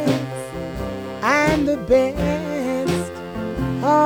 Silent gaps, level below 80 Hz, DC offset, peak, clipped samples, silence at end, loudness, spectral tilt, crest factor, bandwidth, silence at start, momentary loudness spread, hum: none; -38 dBFS; 0.1%; -4 dBFS; under 0.1%; 0 s; -21 LUFS; -6 dB/octave; 16 dB; over 20 kHz; 0 s; 12 LU; none